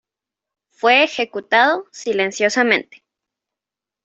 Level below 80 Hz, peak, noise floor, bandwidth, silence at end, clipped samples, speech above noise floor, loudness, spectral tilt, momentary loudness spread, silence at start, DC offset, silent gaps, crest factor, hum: -70 dBFS; -2 dBFS; -88 dBFS; 8.2 kHz; 1.2 s; under 0.1%; 70 dB; -17 LUFS; -2.5 dB/octave; 9 LU; 0.85 s; under 0.1%; none; 18 dB; none